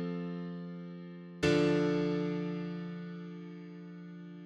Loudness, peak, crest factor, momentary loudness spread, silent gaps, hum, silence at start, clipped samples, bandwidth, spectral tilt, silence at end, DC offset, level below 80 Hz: -34 LUFS; -18 dBFS; 18 dB; 19 LU; none; none; 0 s; under 0.1%; 11 kHz; -7 dB/octave; 0 s; under 0.1%; -62 dBFS